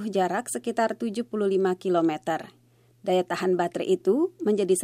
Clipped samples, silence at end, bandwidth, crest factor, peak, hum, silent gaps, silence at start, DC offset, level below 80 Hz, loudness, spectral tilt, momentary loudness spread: under 0.1%; 0 s; 15.5 kHz; 14 dB; -12 dBFS; none; none; 0 s; under 0.1%; -76 dBFS; -26 LUFS; -5 dB/octave; 6 LU